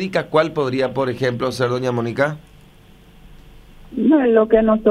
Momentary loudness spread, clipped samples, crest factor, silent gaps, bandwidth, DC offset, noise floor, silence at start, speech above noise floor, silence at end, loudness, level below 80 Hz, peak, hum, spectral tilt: 8 LU; under 0.1%; 18 dB; none; 13.5 kHz; under 0.1%; -46 dBFS; 0 s; 29 dB; 0 s; -18 LUFS; -46 dBFS; -2 dBFS; 50 Hz at -50 dBFS; -7 dB/octave